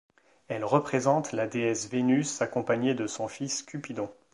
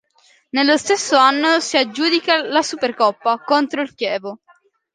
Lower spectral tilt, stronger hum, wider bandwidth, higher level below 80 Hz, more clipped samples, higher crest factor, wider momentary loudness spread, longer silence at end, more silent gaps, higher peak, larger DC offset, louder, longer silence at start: first, -5 dB/octave vs -1.5 dB/octave; neither; first, 11.5 kHz vs 10 kHz; about the same, -70 dBFS vs -70 dBFS; neither; about the same, 20 dB vs 18 dB; about the same, 10 LU vs 9 LU; second, 0.2 s vs 0.6 s; neither; second, -8 dBFS vs 0 dBFS; neither; second, -29 LUFS vs -17 LUFS; about the same, 0.5 s vs 0.55 s